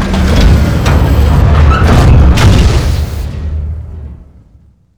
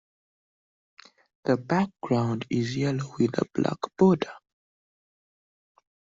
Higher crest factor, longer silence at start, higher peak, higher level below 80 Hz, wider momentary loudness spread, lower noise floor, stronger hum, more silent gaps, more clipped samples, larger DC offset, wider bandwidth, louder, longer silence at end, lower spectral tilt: second, 8 dB vs 22 dB; second, 0 s vs 1.45 s; first, 0 dBFS vs -8 dBFS; first, -10 dBFS vs -64 dBFS; first, 13 LU vs 7 LU; second, -43 dBFS vs under -90 dBFS; neither; neither; first, 0.1% vs under 0.1%; neither; first, 15 kHz vs 7.6 kHz; first, -9 LUFS vs -26 LUFS; second, 0.75 s vs 1.75 s; about the same, -6.5 dB/octave vs -7 dB/octave